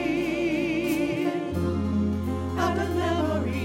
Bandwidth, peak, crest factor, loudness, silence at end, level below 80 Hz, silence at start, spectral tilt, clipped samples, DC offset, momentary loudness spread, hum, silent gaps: 16.5 kHz; -12 dBFS; 14 dB; -26 LUFS; 0 s; -48 dBFS; 0 s; -6.5 dB/octave; under 0.1%; under 0.1%; 2 LU; none; none